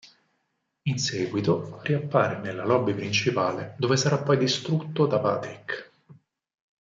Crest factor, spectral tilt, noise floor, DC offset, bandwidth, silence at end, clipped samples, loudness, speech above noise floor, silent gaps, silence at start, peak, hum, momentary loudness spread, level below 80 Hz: 20 dB; -5 dB/octave; -77 dBFS; under 0.1%; 7.8 kHz; 0.7 s; under 0.1%; -26 LUFS; 51 dB; none; 0.05 s; -8 dBFS; none; 8 LU; -68 dBFS